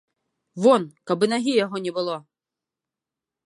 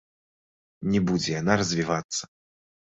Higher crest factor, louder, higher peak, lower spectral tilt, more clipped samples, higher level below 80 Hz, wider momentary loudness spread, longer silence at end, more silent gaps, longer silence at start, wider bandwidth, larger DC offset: about the same, 20 dB vs 22 dB; first, -22 LUFS vs -26 LUFS; about the same, -4 dBFS vs -6 dBFS; about the same, -5 dB/octave vs -4.5 dB/octave; neither; second, -74 dBFS vs -54 dBFS; about the same, 11 LU vs 9 LU; first, 1.3 s vs 0.65 s; second, none vs 2.04-2.09 s; second, 0.55 s vs 0.8 s; first, 11.5 kHz vs 8.2 kHz; neither